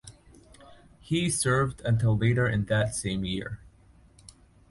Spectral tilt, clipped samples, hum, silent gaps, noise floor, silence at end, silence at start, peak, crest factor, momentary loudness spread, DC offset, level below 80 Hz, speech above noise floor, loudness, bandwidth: -5 dB/octave; under 0.1%; none; none; -57 dBFS; 1 s; 0.05 s; -12 dBFS; 16 dB; 9 LU; under 0.1%; -50 dBFS; 31 dB; -27 LUFS; 11.5 kHz